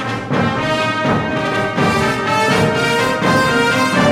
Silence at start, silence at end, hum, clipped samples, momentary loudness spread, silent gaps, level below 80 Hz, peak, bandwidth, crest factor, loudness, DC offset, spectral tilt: 0 s; 0 s; none; under 0.1%; 4 LU; none; -42 dBFS; -2 dBFS; 17.5 kHz; 14 dB; -15 LUFS; under 0.1%; -5 dB/octave